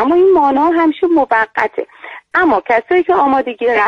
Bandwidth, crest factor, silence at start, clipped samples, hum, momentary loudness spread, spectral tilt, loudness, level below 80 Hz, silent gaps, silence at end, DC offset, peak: 6.4 kHz; 12 dB; 0 s; under 0.1%; none; 9 LU; -6 dB/octave; -13 LUFS; -50 dBFS; none; 0 s; under 0.1%; 0 dBFS